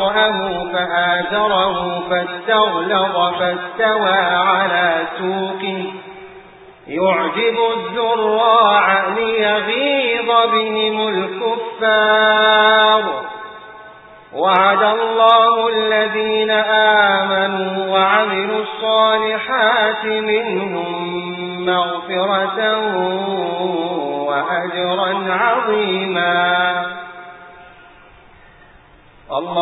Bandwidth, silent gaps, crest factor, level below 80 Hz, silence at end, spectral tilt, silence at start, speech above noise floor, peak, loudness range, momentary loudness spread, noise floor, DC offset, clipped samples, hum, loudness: 4.1 kHz; none; 16 dB; -56 dBFS; 0 s; -7.5 dB/octave; 0 s; 30 dB; 0 dBFS; 5 LU; 11 LU; -46 dBFS; under 0.1%; under 0.1%; none; -16 LUFS